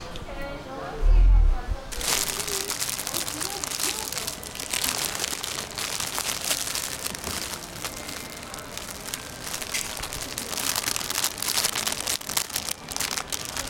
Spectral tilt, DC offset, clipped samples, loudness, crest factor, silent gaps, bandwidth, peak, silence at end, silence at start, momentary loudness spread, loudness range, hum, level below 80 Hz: -1.5 dB/octave; under 0.1%; under 0.1%; -27 LUFS; 22 dB; none; 17 kHz; -4 dBFS; 0 s; 0 s; 11 LU; 5 LU; none; -30 dBFS